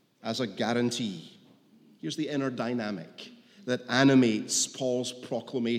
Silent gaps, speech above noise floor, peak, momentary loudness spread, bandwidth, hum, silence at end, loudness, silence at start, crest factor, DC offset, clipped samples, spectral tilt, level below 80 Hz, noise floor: none; 31 dB; -8 dBFS; 19 LU; 15 kHz; none; 0 s; -28 LUFS; 0.25 s; 20 dB; under 0.1%; under 0.1%; -4 dB/octave; -84 dBFS; -59 dBFS